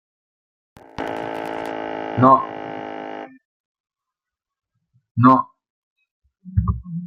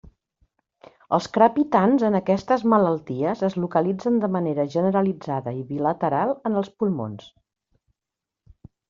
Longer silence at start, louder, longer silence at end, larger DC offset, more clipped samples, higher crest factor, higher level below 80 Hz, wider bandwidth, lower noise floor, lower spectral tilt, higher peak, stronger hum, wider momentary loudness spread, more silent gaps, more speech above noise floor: about the same, 1 s vs 1.1 s; about the same, -20 LUFS vs -22 LUFS; second, 0 s vs 1.6 s; neither; neither; about the same, 22 dB vs 20 dB; first, -40 dBFS vs -60 dBFS; about the same, 7 kHz vs 7.4 kHz; about the same, -87 dBFS vs -87 dBFS; first, -9 dB/octave vs -7 dB/octave; about the same, -2 dBFS vs -4 dBFS; neither; first, 20 LU vs 9 LU; first, 3.45-3.84 s, 5.11-5.15 s, 5.70-5.96 s, 6.11-6.22 s vs none; first, 71 dB vs 65 dB